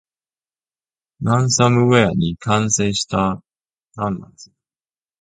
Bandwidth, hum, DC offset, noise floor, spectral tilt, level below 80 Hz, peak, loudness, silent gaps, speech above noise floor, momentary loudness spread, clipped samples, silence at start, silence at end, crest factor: 9.4 kHz; none; under 0.1%; under -90 dBFS; -4.5 dB/octave; -46 dBFS; 0 dBFS; -17 LUFS; none; over 73 dB; 12 LU; under 0.1%; 1.2 s; 0.8 s; 20 dB